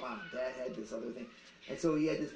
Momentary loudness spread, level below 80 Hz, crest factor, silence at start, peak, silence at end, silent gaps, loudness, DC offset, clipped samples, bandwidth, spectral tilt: 16 LU; -66 dBFS; 18 dB; 0 s; -20 dBFS; 0 s; none; -38 LUFS; under 0.1%; under 0.1%; 9.2 kHz; -5.5 dB/octave